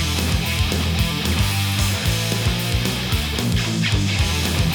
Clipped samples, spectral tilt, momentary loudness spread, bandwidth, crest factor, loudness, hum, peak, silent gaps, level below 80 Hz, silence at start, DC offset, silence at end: under 0.1%; -4 dB/octave; 1 LU; over 20 kHz; 14 dB; -20 LUFS; none; -6 dBFS; none; -28 dBFS; 0 s; under 0.1%; 0 s